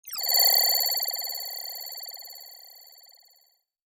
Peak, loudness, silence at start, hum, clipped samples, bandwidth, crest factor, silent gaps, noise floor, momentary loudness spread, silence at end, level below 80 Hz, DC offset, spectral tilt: -8 dBFS; -22 LUFS; 0.05 s; none; under 0.1%; over 20 kHz; 20 dB; none; -66 dBFS; 23 LU; 1.15 s; -90 dBFS; under 0.1%; 6 dB/octave